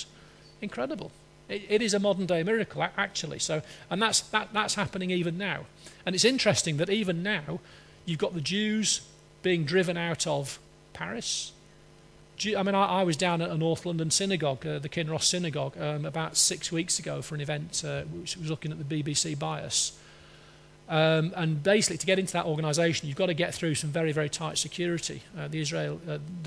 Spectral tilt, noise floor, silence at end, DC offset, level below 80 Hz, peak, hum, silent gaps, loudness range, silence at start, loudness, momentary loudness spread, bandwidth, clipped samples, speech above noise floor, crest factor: -3.5 dB/octave; -55 dBFS; 0 s; under 0.1%; -62 dBFS; -8 dBFS; none; none; 4 LU; 0 s; -28 LUFS; 11 LU; 11 kHz; under 0.1%; 26 dB; 20 dB